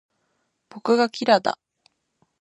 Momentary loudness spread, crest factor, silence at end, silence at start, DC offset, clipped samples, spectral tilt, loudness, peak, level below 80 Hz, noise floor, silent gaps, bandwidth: 12 LU; 22 dB; 0.9 s; 0.75 s; under 0.1%; under 0.1%; -4.5 dB/octave; -21 LUFS; -2 dBFS; -78 dBFS; -73 dBFS; none; 10.5 kHz